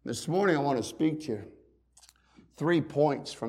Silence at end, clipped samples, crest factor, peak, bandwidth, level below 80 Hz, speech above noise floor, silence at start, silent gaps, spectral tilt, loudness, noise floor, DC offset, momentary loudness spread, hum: 0 s; under 0.1%; 18 dB; -12 dBFS; 14.5 kHz; -66 dBFS; 32 dB; 0.05 s; none; -6 dB/octave; -29 LUFS; -61 dBFS; under 0.1%; 10 LU; none